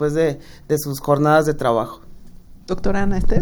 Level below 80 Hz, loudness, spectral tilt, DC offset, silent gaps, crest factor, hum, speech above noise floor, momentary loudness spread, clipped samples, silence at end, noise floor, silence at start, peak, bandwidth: -28 dBFS; -20 LUFS; -6.5 dB/octave; under 0.1%; none; 16 dB; none; 22 dB; 12 LU; under 0.1%; 0 s; -39 dBFS; 0 s; -2 dBFS; over 20 kHz